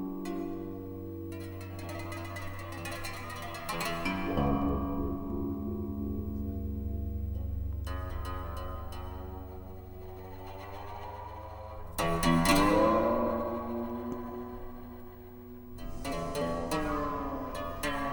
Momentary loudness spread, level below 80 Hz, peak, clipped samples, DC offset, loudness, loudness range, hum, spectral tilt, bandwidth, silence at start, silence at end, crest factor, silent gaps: 17 LU; -42 dBFS; -12 dBFS; under 0.1%; under 0.1%; -34 LUFS; 11 LU; none; -5.5 dB/octave; 18 kHz; 0 s; 0 s; 22 dB; none